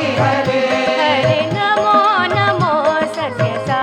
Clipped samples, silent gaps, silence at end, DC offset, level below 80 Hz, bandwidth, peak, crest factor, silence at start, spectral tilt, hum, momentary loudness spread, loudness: under 0.1%; none; 0 s; under 0.1%; -52 dBFS; 11 kHz; -2 dBFS; 14 dB; 0 s; -5.5 dB/octave; none; 6 LU; -15 LUFS